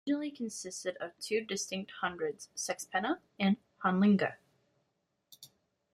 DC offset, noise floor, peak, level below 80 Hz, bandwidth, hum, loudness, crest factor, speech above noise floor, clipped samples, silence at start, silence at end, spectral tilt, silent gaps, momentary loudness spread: under 0.1%; -81 dBFS; -16 dBFS; -76 dBFS; 14 kHz; none; -34 LUFS; 18 dB; 47 dB; under 0.1%; 0.05 s; 0.5 s; -4.5 dB/octave; none; 11 LU